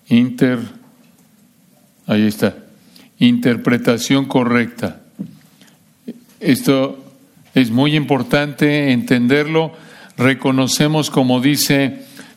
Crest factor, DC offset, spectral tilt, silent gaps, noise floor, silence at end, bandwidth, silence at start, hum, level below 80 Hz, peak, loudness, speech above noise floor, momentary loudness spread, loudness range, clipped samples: 16 dB; under 0.1%; -5 dB/octave; none; -52 dBFS; 0.15 s; 16 kHz; 0.1 s; none; -58 dBFS; -2 dBFS; -16 LUFS; 37 dB; 19 LU; 4 LU; under 0.1%